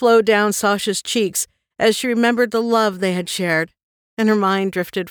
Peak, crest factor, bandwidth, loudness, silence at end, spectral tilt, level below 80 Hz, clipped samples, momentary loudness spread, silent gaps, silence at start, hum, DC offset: -4 dBFS; 14 dB; over 20 kHz; -18 LUFS; 0 s; -4 dB/octave; -62 dBFS; under 0.1%; 7 LU; 3.83-4.17 s; 0 s; none; under 0.1%